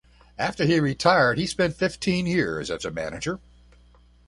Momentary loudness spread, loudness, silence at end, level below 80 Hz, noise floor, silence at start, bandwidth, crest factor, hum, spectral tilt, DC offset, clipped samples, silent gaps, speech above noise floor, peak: 11 LU; -24 LUFS; 0.9 s; -50 dBFS; -55 dBFS; 0.4 s; 11.5 kHz; 20 dB; 60 Hz at -45 dBFS; -5 dB/octave; under 0.1%; under 0.1%; none; 31 dB; -4 dBFS